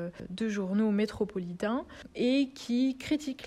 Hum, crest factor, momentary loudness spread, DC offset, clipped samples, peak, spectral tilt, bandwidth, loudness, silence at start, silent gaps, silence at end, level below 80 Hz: none; 14 dB; 8 LU; under 0.1%; under 0.1%; -18 dBFS; -6 dB/octave; 13 kHz; -31 LUFS; 0 s; none; 0 s; -60 dBFS